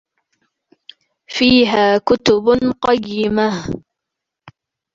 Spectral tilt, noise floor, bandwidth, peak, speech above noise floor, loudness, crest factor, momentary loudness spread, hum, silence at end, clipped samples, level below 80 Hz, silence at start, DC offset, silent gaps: -5 dB/octave; -81 dBFS; 7.6 kHz; -2 dBFS; 67 dB; -15 LUFS; 16 dB; 13 LU; none; 0.45 s; under 0.1%; -46 dBFS; 1.3 s; under 0.1%; none